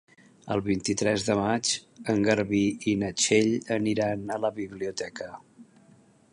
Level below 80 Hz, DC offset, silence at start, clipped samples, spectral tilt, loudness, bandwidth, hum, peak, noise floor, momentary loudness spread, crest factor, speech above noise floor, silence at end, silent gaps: -58 dBFS; under 0.1%; 0.45 s; under 0.1%; -4 dB/octave; -27 LUFS; 11 kHz; none; -8 dBFS; -58 dBFS; 11 LU; 20 dB; 31 dB; 0.7 s; none